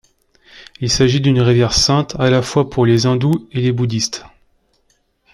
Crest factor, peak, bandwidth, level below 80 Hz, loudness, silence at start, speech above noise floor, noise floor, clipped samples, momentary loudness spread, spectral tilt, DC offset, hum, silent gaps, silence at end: 14 dB; -2 dBFS; 13 kHz; -38 dBFS; -15 LUFS; 0.6 s; 47 dB; -61 dBFS; under 0.1%; 7 LU; -5 dB/octave; under 0.1%; none; none; 1.05 s